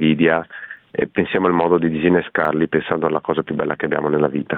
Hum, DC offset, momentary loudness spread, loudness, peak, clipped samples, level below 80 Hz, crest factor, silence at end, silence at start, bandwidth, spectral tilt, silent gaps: none; under 0.1%; 6 LU; -19 LUFS; -4 dBFS; under 0.1%; -52 dBFS; 16 dB; 0 s; 0 s; 4.1 kHz; -10 dB/octave; none